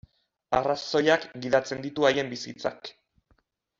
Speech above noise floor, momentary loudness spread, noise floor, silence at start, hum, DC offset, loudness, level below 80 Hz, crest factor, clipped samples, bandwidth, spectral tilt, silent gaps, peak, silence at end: 43 dB; 11 LU; -69 dBFS; 0.5 s; none; under 0.1%; -26 LUFS; -60 dBFS; 20 dB; under 0.1%; 7.8 kHz; -4.5 dB/octave; none; -8 dBFS; 0.9 s